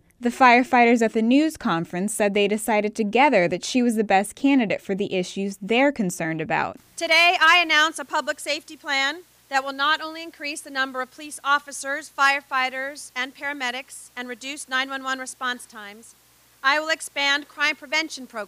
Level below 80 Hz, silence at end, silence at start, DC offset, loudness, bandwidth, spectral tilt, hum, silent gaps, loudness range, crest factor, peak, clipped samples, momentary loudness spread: -64 dBFS; 0 s; 0.2 s; under 0.1%; -22 LUFS; 15.5 kHz; -3.5 dB/octave; none; none; 8 LU; 20 dB; -2 dBFS; under 0.1%; 15 LU